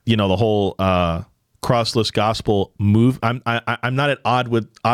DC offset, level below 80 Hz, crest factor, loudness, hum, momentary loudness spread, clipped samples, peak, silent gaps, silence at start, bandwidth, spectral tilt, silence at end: under 0.1%; -48 dBFS; 14 dB; -19 LUFS; none; 6 LU; under 0.1%; -4 dBFS; none; 0.05 s; 14.5 kHz; -6.5 dB/octave; 0 s